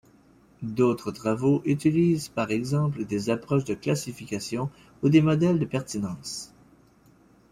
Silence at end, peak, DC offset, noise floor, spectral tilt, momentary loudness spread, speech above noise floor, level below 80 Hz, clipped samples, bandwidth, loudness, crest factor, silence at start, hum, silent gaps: 1.05 s; -8 dBFS; under 0.1%; -58 dBFS; -6.5 dB/octave; 12 LU; 33 dB; -58 dBFS; under 0.1%; 15.5 kHz; -26 LUFS; 18 dB; 0.6 s; none; none